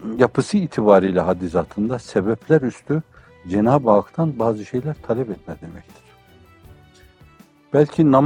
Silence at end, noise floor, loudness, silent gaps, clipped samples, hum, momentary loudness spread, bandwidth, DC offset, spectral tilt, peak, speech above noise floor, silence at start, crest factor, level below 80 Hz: 0 s; -50 dBFS; -19 LUFS; none; under 0.1%; none; 11 LU; 10.5 kHz; under 0.1%; -8 dB/octave; 0 dBFS; 31 dB; 0 s; 20 dB; -52 dBFS